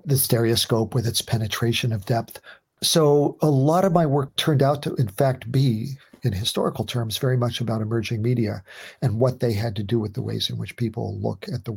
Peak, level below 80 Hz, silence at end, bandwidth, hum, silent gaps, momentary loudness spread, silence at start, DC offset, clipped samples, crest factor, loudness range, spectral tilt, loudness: -2 dBFS; -58 dBFS; 0 s; 17 kHz; none; none; 9 LU; 0.05 s; under 0.1%; under 0.1%; 20 dB; 4 LU; -5.5 dB/octave; -23 LUFS